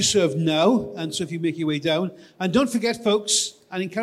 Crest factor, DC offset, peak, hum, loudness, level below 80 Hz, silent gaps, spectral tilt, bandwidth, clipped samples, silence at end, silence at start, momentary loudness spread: 16 dB; under 0.1%; -6 dBFS; none; -22 LUFS; -58 dBFS; none; -4 dB/octave; 15 kHz; under 0.1%; 0 s; 0 s; 9 LU